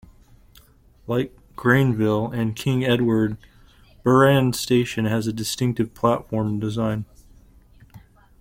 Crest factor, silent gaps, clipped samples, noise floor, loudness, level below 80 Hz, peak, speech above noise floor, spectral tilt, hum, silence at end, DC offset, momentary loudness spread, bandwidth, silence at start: 18 dB; none; under 0.1%; -52 dBFS; -22 LUFS; -50 dBFS; -4 dBFS; 32 dB; -6 dB/octave; none; 0.4 s; under 0.1%; 9 LU; 16.5 kHz; 1.05 s